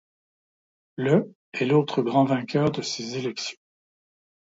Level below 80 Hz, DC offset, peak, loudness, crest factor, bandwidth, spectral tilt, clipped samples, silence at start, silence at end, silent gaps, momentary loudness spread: -66 dBFS; under 0.1%; -6 dBFS; -25 LUFS; 20 dB; 7.8 kHz; -6 dB/octave; under 0.1%; 1 s; 1.05 s; 1.35-1.52 s; 11 LU